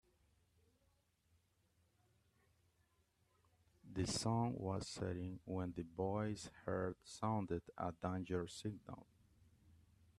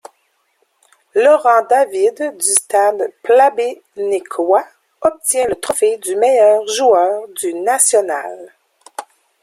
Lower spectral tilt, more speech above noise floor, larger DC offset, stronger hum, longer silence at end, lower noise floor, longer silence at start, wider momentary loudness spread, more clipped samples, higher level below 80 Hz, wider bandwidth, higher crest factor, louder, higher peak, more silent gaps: first, -5.5 dB/octave vs -1 dB/octave; second, 36 dB vs 49 dB; neither; neither; about the same, 0.45 s vs 0.4 s; first, -80 dBFS vs -63 dBFS; first, 3.85 s vs 1.15 s; second, 9 LU vs 12 LU; neither; second, -70 dBFS vs -62 dBFS; second, 13 kHz vs 16 kHz; about the same, 20 dB vs 16 dB; second, -44 LUFS vs -14 LUFS; second, -26 dBFS vs 0 dBFS; neither